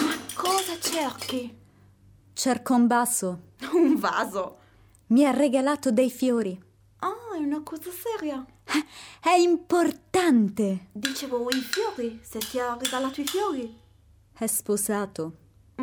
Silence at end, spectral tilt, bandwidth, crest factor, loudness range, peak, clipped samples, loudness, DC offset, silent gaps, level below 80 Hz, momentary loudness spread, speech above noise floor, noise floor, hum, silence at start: 0 s; -3.5 dB/octave; over 20 kHz; 18 dB; 5 LU; -8 dBFS; under 0.1%; -26 LUFS; under 0.1%; none; -64 dBFS; 13 LU; 32 dB; -57 dBFS; none; 0 s